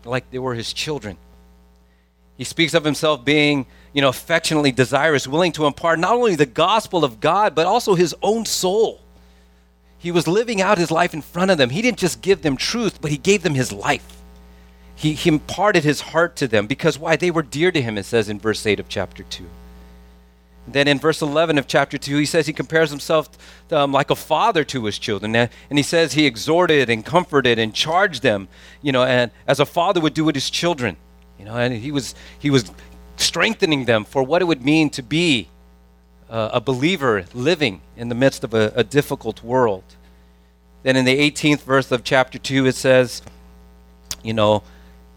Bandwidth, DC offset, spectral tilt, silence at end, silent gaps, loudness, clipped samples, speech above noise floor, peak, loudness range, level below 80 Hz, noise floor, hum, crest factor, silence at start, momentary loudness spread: 18.5 kHz; under 0.1%; -4.5 dB/octave; 0.55 s; none; -19 LUFS; under 0.1%; 36 dB; 0 dBFS; 4 LU; -48 dBFS; -55 dBFS; none; 18 dB; 0.05 s; 8 LU